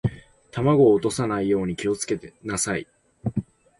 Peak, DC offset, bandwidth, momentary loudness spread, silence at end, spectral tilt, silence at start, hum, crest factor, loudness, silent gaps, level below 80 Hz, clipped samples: -6 dBFS; under 0.1%; 11.5 kHz; 13 LU; 0.35 s; -5.5 dB/octave; 0.05 s; none; 16 dB; -24 LUFS; none; -50 dBFS; under 0.1%